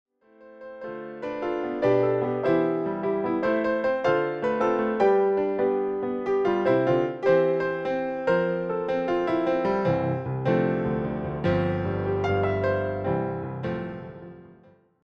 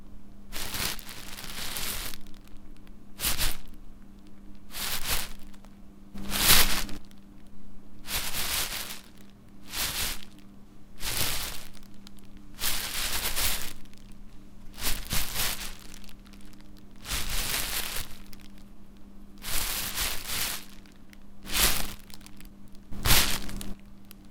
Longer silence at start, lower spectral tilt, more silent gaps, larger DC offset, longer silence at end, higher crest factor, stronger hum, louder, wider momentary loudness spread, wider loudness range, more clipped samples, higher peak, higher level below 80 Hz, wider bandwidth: first, 0.4 s vs 0 s; first, -8.5 dB/octave vs -1 dB/octave; neither; neither; first, 0.55 s vs 0 s; second, 14 dB vs 28 dB; neither; first, -25 LUFS vs -29 LUFS; second, 10 LU vs 25 LU; second, 3 LU vs 7 LU; neither; second, -10 dBFS vs -2 dBFS; second, -54 dBFS vs -38 dBFS; second, 6.6 kHz vs 18 kHz